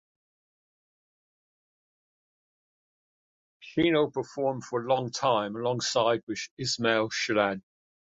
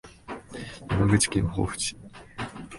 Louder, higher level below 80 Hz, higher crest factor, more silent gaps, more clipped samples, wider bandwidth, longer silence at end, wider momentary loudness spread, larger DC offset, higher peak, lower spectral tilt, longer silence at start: about the same, -28 LUFS vs -26 LUFS; second, -66 dBFS vs -42 dBFS; about the same, 20 dB vs 22 dB; first, 6.23-6.27 s, 6.51-6.57 s vs none; neither; second, 8.4 kHz vs 11.5 kHz; first, 0.5 s vs 0 s; second, 7 LU vs 20 LU; neither; second, -10 dBFS vs -6 dBFS; about the same, -4 dB/octave vs -4.5 dB/octave; first, 3.6 s vs 0.05 s